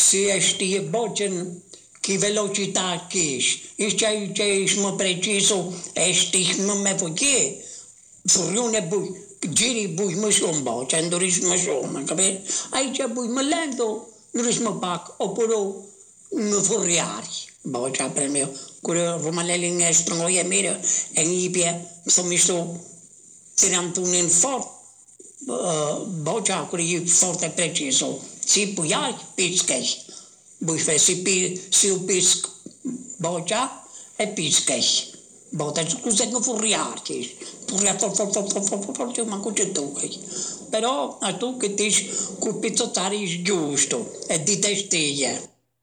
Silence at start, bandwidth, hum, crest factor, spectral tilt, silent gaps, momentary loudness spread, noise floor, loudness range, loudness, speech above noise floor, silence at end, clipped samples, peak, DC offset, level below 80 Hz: 0 s; over 20 kHz; none; 12 dB; -2 dB/octave; none; 12 LU; -48 dBFS; 4 LU; -21 LUFS; 25 dB; 0.35 s; under 0.1%; -12 dBFS; under 0.1%; -66 dBFS